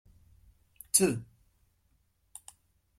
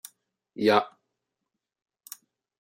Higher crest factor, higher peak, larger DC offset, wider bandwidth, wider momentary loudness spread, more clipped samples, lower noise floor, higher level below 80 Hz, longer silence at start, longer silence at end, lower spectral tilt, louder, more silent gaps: about the same, 28 dB vs 24 dB; about the same, -8 dBFS vs -8 dBFS; neither; about the same, 16 kHz vs 16 kHz; about the same, 25 LU vs 24 LU; neither; second, -72 dBFS vs -85 dBFS; first, -64 dBFS vs -80 dBFS; first, 0.95 s vs 0.6 s; about the same, 1.75 s vs 1.75 s; about the same, -3.5 dB/octave vs -4.5 dB/octave; second, -27 LUFS vs -24 LUFS; neither